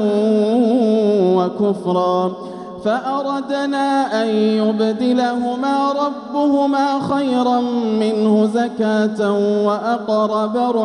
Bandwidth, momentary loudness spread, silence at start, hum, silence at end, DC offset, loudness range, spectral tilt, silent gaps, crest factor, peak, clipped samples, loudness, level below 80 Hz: 10.5 kHz; 6 LU; 0 s; none; 0 s; under 0.1%; 2 LU; -6.5 dB/octave; none; 12 dB; -4 dBFS; under 0.1%; -17 LUFS; -62 dBFS